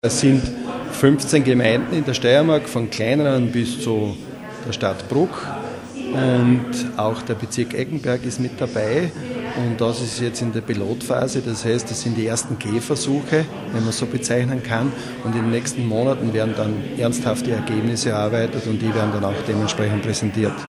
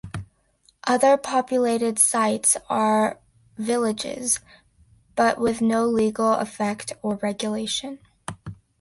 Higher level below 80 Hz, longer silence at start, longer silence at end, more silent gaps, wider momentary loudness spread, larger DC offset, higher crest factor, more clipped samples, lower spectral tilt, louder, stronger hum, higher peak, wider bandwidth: first, -50 dBFS vs -56 dBFS; about the same, 0.05 s vs 0.05 s; second, 0 s vs 0.25 s; neither; second, 9 LU vs 18 LU; neither; about the same, 20 dB vs 20 dB; neither; first, -5.5 dB/octave vs -3 dB/octave; about the same, -21 LUFS vs -22 LUFS; neither; first, 0 dBFS vs -4 dBFS; first, 13.5 kHz vs 12 kHz